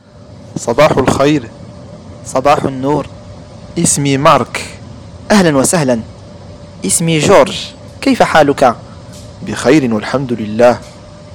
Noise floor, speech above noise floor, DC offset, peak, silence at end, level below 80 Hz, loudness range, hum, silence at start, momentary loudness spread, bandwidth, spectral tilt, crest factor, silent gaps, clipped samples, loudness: -35 dBFS; 24 dB; under 0.1%; 0 dBFS; 0 s; -40 dBFS; 2 LU; none; 0.3 s; 23 LU; 19.5 kHz; -4.5 dB/octave; 14 dB; none; 0.2%; -12 LUFS